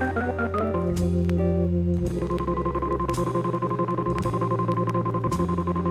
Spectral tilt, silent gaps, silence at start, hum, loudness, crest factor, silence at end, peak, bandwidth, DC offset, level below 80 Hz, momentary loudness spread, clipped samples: -8 dB/octave; none; 0 s; none; -25 LUFS; 12 dB; 0 s; -12 dBFS; 13 kHz; under 0.1%; -38 dBFS; 3 LU; under 0.1%